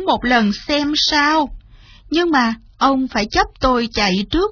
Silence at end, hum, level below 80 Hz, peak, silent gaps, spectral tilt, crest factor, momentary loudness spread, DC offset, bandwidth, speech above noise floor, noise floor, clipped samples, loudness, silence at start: 0 s; none; -36 dBFS; 0 dBFS; none; -4 dB/octave; 16 dB; 5 LU; under 0.1%; 5.4 kHz; 27 dB; -43 dBFS; under 0.1%; -16 LUFS; 0 s